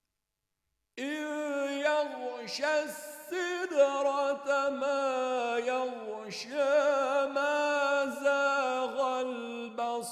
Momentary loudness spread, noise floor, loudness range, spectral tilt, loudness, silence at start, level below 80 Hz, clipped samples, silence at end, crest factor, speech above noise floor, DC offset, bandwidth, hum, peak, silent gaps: 11 LU; -86 dBFS; 4 LU; -2.5 dB/octave; -31 LUFS; 0.95 s; -84 dBFS; under 0.1%; 0 s; 18 dB; 56 dB; under 0.1%; 15 kHz; none; -14 dBFS; none